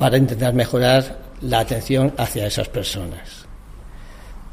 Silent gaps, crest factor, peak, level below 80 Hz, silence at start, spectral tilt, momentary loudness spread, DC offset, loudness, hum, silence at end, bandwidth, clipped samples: none; 18 dB; -2 dBFS; -36 dBFS; 0 s; -5.5 dB/octave; 16 LU; under 0.1%; -19 LUFS; none; 0 s; 15.5 kHz; under 0.1%